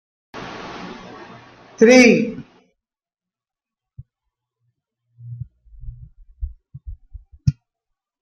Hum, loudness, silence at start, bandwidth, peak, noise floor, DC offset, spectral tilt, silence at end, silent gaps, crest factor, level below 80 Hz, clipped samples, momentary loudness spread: none; -14 LUFS; 0.35 s; 11 kHz; -2 dBFS; under -90 dBFS; under 0.1%; -5 dB/octave; 0.7 s; none; 22 dB; -42 dBFS; under 0.1%; 29 LU